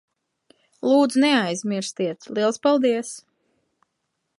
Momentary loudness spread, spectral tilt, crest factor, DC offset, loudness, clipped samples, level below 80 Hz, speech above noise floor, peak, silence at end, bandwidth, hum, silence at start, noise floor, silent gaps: 10 LU; -4 dB/octave; 16 dB; under 0.1%; -21 LUFS; under 0.1%; -76 dBFS; 56 dB; -6 dBFS; 1.2 s; 11.5 kHz; none; 0.85 s; -77 dBFS; none